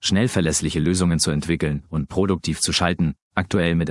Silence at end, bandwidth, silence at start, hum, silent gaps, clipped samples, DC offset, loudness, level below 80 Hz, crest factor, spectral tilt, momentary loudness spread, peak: 0 s; 12 kHz; 0 s; none; 3.22-3.31 s; under 0.1%; under 0.1%; -21 LUFS; -42 dBFS; 20 dB; -4.5 dB/octave; 5 LU; 0 dBFS